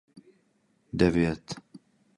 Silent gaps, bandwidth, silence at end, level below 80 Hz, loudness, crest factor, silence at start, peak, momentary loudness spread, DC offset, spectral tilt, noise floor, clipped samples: none; 11.5 kHz; 0.4 s; -48 dBFS; -27 LUFS; 22 dB; 0.15 s; -8 dBFS; 18 LU; under 0.1%; -7 dB/octave; -69 dBFS; under 0.1%